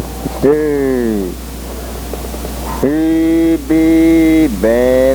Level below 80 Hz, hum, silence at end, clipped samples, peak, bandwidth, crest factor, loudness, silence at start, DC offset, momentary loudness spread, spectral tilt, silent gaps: -26 dBFS; none; 0 s; under 0.1%; 0 dBFS; over 20 kHz; 12 dB; -13 LUFS; 0 s; under 0.1%; 15 LU; -6.5 dB/octave; none